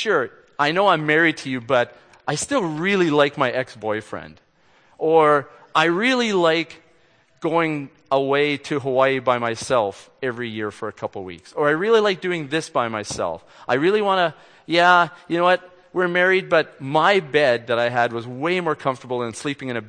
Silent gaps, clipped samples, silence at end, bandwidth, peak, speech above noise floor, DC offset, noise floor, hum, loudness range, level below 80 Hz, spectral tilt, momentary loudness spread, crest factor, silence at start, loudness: none; under 0.1%; 0 s; 9.8 kHz; -2 dBFS; 38 dB; under 0.1%; -58 dBFS; none; 4 LU; -64 dBFS; -4.5 dB/octave; 11 LU; 20 dB; 0 s; -20 LUFS